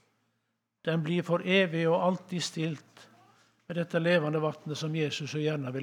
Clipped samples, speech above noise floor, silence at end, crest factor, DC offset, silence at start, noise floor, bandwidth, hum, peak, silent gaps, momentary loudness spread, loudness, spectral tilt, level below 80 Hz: under 0.1%; 51 dB; 0 s; 20 dB; under 0.1%; 0.85 s; -80 dBFS; 12 kHz; none; -10 dBFS; none; 10 LU; -30 LUFS; -5.5 dB/octave; -86 dBFS